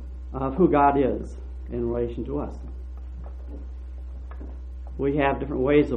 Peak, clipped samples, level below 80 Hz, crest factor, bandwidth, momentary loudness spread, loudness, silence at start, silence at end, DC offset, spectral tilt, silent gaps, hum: -6 dBFS; under 0.1%; -36 dBFS; 20 dB; 6 kHz; 18 LU; -24 LUFS; 0 s; 0 s; under 0.1%; -9 dB/octave; none; none